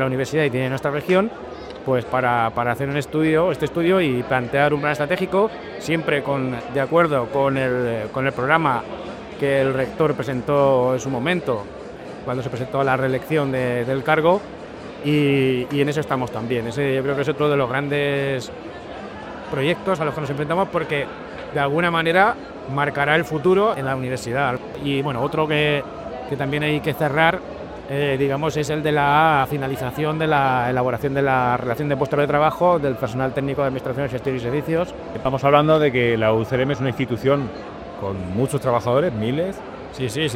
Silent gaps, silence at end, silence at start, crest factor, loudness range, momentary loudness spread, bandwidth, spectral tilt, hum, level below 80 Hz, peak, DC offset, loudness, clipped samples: none; 0 s; 0 s; 20 dB; 3 LU; 11 LU; 16 kHz; -6.5 dB/octave; none; -48 dBFS; 0 dBFS; under 0.1%; -21 LUFS; under 0.1%